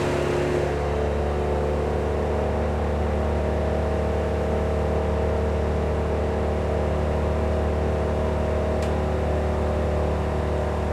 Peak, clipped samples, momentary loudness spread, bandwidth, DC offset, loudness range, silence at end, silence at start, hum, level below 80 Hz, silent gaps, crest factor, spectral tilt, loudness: -12 dBFS; under 0.1%; 1 LU; 10.5 kHz; under 0.1%; 0 LU; 0 s; 0 s; none; -28 dBFS; none; 12 dB; -7.5 dB/octave; -24 LUFS